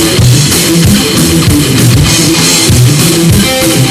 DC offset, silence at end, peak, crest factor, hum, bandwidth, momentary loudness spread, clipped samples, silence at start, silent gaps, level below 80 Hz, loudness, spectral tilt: under 0.1%; 0 s; 0 dBFS; 6 dB; none; 16 kHz; 2 LU; 2%; 0 s; none; -22 dBFS; -6 LUFS; -4 dB/octave